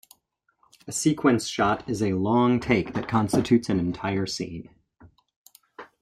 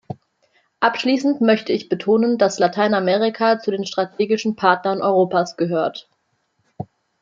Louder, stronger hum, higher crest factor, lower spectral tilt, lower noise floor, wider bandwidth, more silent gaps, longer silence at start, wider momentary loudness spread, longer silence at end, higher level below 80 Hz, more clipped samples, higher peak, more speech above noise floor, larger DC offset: second, -24 LUFS vs -19 LUFS; neither; about the same, 18 dB vs 18 dB; about the same, -5.5 dB/octave vs -5.5 dB/octave; about the same, -71 dBFS vs -68 dBFS; first, 15 kHz vs 7.6 kHz; first, 5.36-5.46 s vs none; first, 0.85 s vs 0.1 s; second, 9 LU vs 19 LU; second, 0.2 s vs 0.4 s; first, -54 dBFS vs -68 dBFS; neither; second, -8 dBFS vs -2 dBFS; about the same, 47 dB vs 50 dB; neither